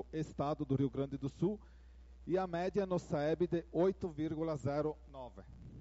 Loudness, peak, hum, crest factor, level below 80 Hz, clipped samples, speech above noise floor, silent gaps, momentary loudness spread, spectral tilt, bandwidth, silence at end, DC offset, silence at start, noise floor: -37 LUFS; -22 dBFS; none; 16 dB; -58 dBFS; under 0.1%; 20 dB; none; 16 LU; -7.5 dB/octave; 8 kHz; 0 s; under 0.1%; 0 s; -56 dBFS